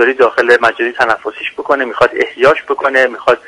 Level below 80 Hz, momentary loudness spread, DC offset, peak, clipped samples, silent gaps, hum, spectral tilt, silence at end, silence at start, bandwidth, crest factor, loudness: -50 dBFS; 6 LU; under 0.1%; 0 dBFS; 0.3%; none; none; -4 dB/octave; 0.1 s; 0 s; 11.5 kHz; 12 dB; -12 LUFS